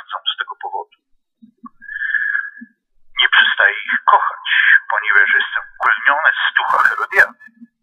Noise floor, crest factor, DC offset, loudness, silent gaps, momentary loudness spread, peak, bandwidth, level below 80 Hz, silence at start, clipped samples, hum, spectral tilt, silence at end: -58 dBFS; 16 dB; under 0.1%; -14 LUFS; none; 14 LU; 0 dBFS; 15 kHz; -62 dBFS; 0.1 s; under 0.1%; none; -0.5 dB/octave; 0.5 s